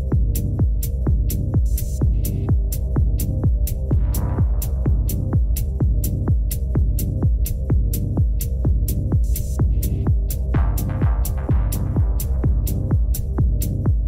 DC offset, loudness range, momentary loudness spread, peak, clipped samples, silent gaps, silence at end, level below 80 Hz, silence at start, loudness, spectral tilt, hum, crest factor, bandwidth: under 0.1%; 0 LU; 1 LU; -10 dBFS; under 0.1%; none; 0 s; -20 dBFS; 0 s; -21 LUFS; -7 dB/octave; none; 10 dB; 16 kHz